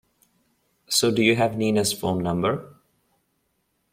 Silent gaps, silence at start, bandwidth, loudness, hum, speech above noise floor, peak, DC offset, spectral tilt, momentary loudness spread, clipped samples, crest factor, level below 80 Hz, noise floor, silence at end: none; 0.9 s; 16.5 kHz; -22 LUFS; none; 50 dB; -4 dBFS; under 0.1%; -4 dB/octave; 6 LU; under 0.1%; 20 dB; -60 dBFS; -72 dBFS; 1.25 s